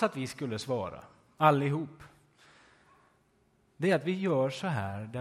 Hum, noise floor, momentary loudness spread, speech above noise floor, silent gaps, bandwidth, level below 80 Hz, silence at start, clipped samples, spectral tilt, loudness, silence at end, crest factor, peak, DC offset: none; -69 dBFS; 12 LU; 39 dB; none; 14.5 kHz; -64 dBFS; 0 s; under 0.1%; -6.5 dB/octave; -31 LUFS; 0 s; 22 dB; -10 dBFS; under 0.1%